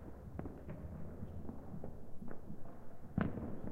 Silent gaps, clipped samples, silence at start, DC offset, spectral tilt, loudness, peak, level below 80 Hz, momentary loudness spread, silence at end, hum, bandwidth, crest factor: none; under 0.1%; 0 s; under 0.1%; -9.5 dB/octave; -47 LUFS; -18 dBFS; -54 dBFS; 13 LU; 0 s; none; 3.8 kHz; 24 dB